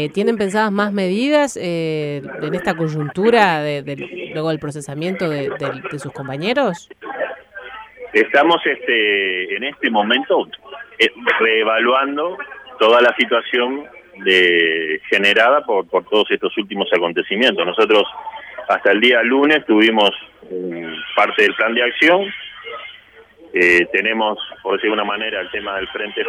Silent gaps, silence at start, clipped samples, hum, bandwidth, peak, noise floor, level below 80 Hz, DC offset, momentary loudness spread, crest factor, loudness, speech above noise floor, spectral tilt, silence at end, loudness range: none; 0 s; under 0.1%; none; 13 kHz; 0 dBFS; -45 dBFS; -60 dBFS; under 0.1%; 15 LU; 18 dB; -16 LUFS; 28 dB; -5 dB/octave; 0 s; 5 LU